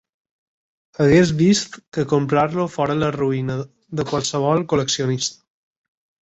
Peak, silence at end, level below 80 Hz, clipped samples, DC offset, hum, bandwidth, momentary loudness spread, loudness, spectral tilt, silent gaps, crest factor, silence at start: -4 dBFS; 0.9 s; -50 dBFS; under 0.1%; under 0.1%; none; 8.2 kHz; 12 LU; -20 LUFS; -5.5 dB/octave; 1.88-1.92 s; 18 dB; 1 s